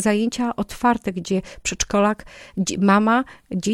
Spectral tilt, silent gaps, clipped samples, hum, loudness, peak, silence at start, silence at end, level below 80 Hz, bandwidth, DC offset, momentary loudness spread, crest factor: -4.5 dB/octave; none; under 0.1%; none; -21 LUFS; -6 dBFS; 0 s; 0 s; -46 dBFS; 13 kHz; under 0.1%; 10 LU; 14 dB